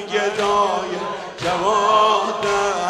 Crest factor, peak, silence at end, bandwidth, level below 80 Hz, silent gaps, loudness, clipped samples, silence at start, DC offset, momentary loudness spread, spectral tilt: 16 dB; -4 dBFS; 0 s; 13 kHz; -52 dBFS; none; -19 LUFS; under 0.1%; 0 s; under 0.1%; 10 LU; -3 dB/octave